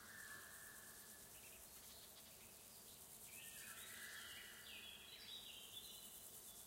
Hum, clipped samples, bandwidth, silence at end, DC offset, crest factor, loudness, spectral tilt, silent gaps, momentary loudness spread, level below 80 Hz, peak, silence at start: none; under 0.1%; 16 kHz; 0 s; under 0.1%; 18 dB; -56 LUFS; -0.5 dB/octave; none; 5 LU; -80 dBFS; -42 dBFS; 0 s